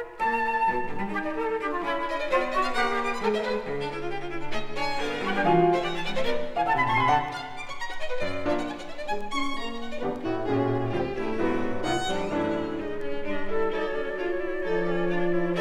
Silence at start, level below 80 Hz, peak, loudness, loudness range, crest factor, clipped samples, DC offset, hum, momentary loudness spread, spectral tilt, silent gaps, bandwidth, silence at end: 0 s; -44 dBFS; -10 dBFS; -28 LUFS; 4 LU; 16 dB; under 0.1%; under 0.1%; none; 10 LU; -5.5 dB/octave; none; 11 kHz; 0 s